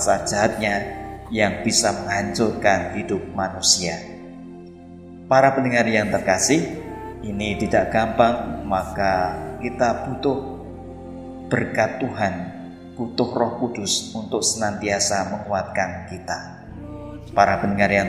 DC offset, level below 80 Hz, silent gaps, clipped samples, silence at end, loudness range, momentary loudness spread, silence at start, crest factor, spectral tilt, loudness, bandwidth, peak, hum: under 0.1%; -46 dBFS; none; under 0.1%; 0 s; 5 LU; 18 LU; 0 s; 22 dB; -3.5 dB/octave; -21 LUFS; 15 kHz; 0 dBFS; none